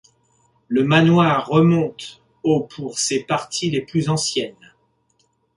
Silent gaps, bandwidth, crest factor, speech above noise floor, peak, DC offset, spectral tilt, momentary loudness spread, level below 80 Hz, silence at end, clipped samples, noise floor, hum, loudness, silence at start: none; 11.5 kHz; 18 dB; 47 dB; -2 dBFS; under 0.1%; -5 dB/octave; 12 LU; -56 dBFS; 1.05 s; under 0.1%; -65 dBFS; none; -19 LUFS; 0.7 s